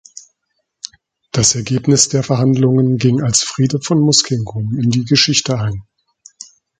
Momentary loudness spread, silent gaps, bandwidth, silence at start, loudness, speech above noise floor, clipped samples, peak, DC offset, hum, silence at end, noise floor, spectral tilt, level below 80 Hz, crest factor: 12 LU; none; 9.6 kHz; 0.15 s; -14 LUFS; 57 dB; under 0.1%; 0 dBFS; under 0.1%; none; 1 s; -71 dBFS; -4 dB/octave; -46 dBFS; 16 dB